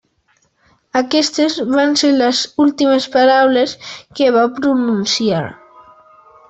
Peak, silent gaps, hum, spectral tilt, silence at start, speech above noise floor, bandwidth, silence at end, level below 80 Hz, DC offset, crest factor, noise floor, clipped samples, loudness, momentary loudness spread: -2 dBFS; none; none; -4 dB/octave; 0.95 s; 46 dB; 8.2 kHz; 0.95 s; -58 dBFS; under 0.1%; 14 dB; -60 dBFS; under 0.1%; -14 LUFS; 9 LU